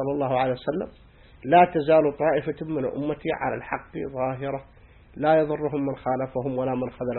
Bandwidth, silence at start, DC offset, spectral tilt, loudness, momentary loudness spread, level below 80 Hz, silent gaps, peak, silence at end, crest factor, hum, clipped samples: 4.3 kHz; 0 s; under 0.1%; -11 dB/octave; -25 LUFS; 13 LU; -52 dBFS; none; -4 dBFS; 0 s; 20 dB; none; under 0.1%